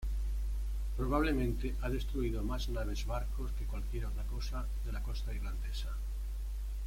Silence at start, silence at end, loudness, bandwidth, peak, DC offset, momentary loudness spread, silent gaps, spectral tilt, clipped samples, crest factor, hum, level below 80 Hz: 0 s; 0 s; -38 LUFS; 16 kHz; -18 dBFS; under 0.1%; 8 LU; none; -6.5 dB/octave; under 0.1%; 16 dB; none; -36 dBFS